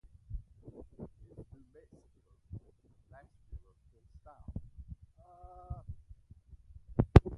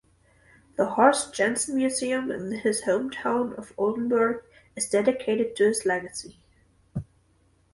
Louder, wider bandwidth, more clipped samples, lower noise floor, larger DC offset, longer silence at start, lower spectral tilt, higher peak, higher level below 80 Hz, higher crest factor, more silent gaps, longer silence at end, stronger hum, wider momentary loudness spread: second, -34 LUFS vs -25 LUFS; second, 9.4 kHz vs 12 kHz; neither; about the same, -66 dBFS vs -64 dBFS; neither; second, 0.3 s vs 0.8 s; first, -9.5 dB/octave vs -4 dB/octave; about the same, -4 dBFS vs -6 dBFS; first, -40 dBFS vs -60 dBFS; first, 32 dB vs 20 dB; neither; second, 0 s vs 0.7 s; neither; about the same, 19 LU vs 17 LU